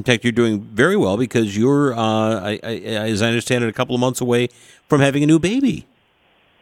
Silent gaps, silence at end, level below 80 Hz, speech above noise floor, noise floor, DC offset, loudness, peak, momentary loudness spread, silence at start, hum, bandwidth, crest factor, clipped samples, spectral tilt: none; 0.8 s; -52 dBFS; 41 dB; -58 dBFS; under 0.1%; -18 LUFS; 0 dBFS; 7 LU; 0 s; none; 16.5 kHz; 18 dB; under 0.1%; -5.5 dB/octave